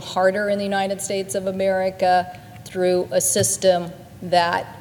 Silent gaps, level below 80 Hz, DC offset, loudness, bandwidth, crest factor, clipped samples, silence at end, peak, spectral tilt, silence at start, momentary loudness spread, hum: none; -58 dBFS; under 0.1%; -20 LUFS; 19 kHz; 18 dB; under 0.1%; 0 s; -4 dBFS; -3.5 dB/octave; 0 s; 12 LU; none